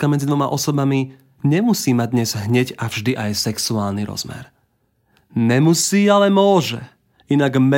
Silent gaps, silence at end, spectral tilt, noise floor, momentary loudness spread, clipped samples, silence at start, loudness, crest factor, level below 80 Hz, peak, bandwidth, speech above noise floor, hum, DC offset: none; 0 s; -5 dB/octave; -64 dBFS; 12 LU; under 0.1%; 0 s; -18 LUFS; 16 dB; -58 dBFS; -2 dBFS; 16.5 kHz; 47 dB; none; under 0.1%